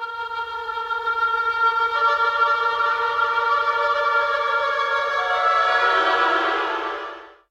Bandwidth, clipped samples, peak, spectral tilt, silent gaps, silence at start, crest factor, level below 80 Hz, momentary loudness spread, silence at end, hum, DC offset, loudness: 9.8 kHz; under 0.1%; -6 dBFS; -2 dB/octave; none; 0 s; 14 dB; -60 dBFS; 10 LU; 0.2 s; none; under 0.1%; -20 LUFS